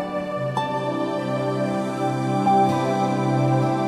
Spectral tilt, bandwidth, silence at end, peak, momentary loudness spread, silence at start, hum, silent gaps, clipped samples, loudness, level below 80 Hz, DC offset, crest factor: -7 dB/octave; 12 kHz; 0 s; -8 dBFS; 6 LU; 0 s; none; none; under 0.1%; -22 LUFS; -60 dBFS; under 0.1%; 14 dB